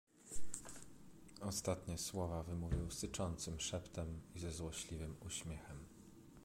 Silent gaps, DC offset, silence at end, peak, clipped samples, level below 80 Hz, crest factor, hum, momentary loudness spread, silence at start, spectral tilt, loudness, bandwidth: none; under 0.1%; 0 s; -24 dBFS; under 0.1%; -54 dBFS; 20 dB; none; 15 LU; 0.05 s; -4.5 dB/octave; -46 LUFS; 16.5 kHz